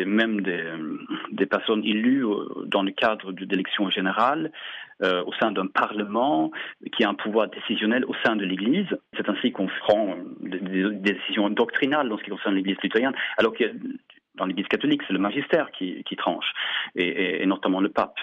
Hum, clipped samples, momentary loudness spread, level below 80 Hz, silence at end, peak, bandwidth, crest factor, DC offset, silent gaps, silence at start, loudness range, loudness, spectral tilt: none; under 0.1%; 9 LU; -70 dBFS; 0 s; -8 dBFS; 7.4 kHz; 16 dB; under 0.1%; none; 0 s; 1 LU; -25 LUFS; -7 dB/octave